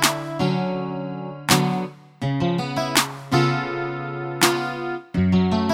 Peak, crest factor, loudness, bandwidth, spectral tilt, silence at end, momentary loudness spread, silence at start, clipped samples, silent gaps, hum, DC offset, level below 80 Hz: 0 dBFS; 22 dB; -22 LUFS; 17 kHz; -4.5 dB/octave; 0 s; 10 LU; 0 s; under 0.1%; none; none; under 0.1%; -50 dBFS